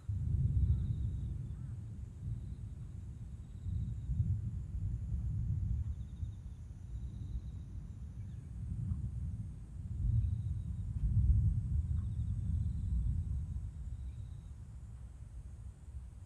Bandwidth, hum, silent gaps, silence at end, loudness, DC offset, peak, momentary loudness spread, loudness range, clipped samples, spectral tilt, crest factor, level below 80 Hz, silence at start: 9 kHz; none; none; 0 s; -39 LUFS; under 0.1%; -18 dBFS; 15 LU; 8 LU; under 0.1%; -9.5 dB/octave; 18 dB; -42 dBFS; 0 s